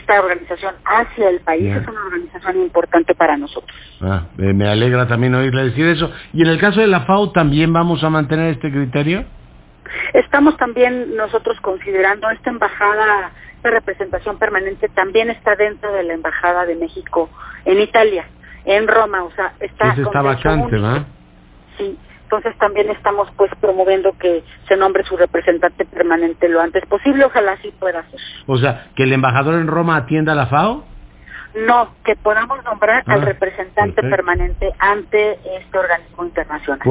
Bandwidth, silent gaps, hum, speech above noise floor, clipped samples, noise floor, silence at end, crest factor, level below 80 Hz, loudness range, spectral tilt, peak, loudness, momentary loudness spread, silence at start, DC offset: 4 kHz; none; none; 29 dB; under 0.1%; -44 dBFS; 0 s; 14 dB; -36 dBFS; 3 LU; -10.5 dB/octave; -2 dBFS; -16 LUFS; 9 LU; 0.1 s; under 0.1%